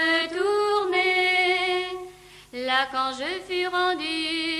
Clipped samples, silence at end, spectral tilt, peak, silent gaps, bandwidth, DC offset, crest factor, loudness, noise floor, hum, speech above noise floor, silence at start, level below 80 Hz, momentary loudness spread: under 0.1%; 0 s; -2 dB/octave; -8 dBFS; none; 14 kHz; under 0.1%; 16 dB; -23 LUFS; -45 dBFS; 50 Hz at -60 dBFS; 19 dB; 0 s; -60 dBFS; 13 LU